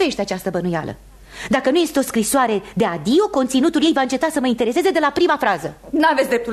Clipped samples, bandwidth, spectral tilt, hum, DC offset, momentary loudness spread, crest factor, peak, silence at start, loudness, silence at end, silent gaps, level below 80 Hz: under 0.1%; 13.5 kHz; -4 dB/octave; none; under 0.1%; 7 LU; 14 dB; -4 dBFS; 0 s; -18 LUFS; 0 s; none; -48 dBFS